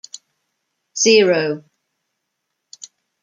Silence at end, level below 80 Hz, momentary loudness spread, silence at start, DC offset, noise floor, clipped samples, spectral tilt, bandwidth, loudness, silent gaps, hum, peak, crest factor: 1.65 s; -72 dBFS; 19 LU; 0.95 s; under 0.1%; -76 dBFS; under 0.1%; -2.5 dB/octave; 9.6 kHz; -15 LUFS; none; none; -2 dBFS; 20 dB